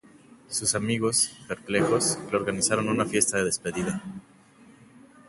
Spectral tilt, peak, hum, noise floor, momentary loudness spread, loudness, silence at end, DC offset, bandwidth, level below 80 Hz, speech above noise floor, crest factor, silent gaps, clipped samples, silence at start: -3 dB/octave; -6 dBFS; none; -54 dBFS; 9 LU; -25 LUFS; 1.1 s; under 0.1%; 12 kHz; -58 dBFS; 28 dB; 22 dB; none; under 0.1%; 0.5 s